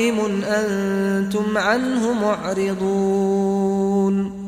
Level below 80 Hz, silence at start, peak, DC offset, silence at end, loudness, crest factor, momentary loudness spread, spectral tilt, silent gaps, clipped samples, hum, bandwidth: -52 dBFS; 0 s; -6 dBFS; under 0.1%; 0 s; -20 LUFS; 14 dB; 2 LU; -6 dB/octave; none; under 0.1%; none; 14.5 kHz